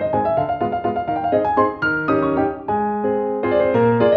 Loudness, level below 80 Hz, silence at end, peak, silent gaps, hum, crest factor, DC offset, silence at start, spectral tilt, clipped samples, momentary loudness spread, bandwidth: -19 LUFS; -48 dBFS; 0 s; -4 dBFS; none; none; 14 dB; under 0.1%; 0 s; -9.5 dB/octave; under 0.1%; 5 LU; 5.4 kHz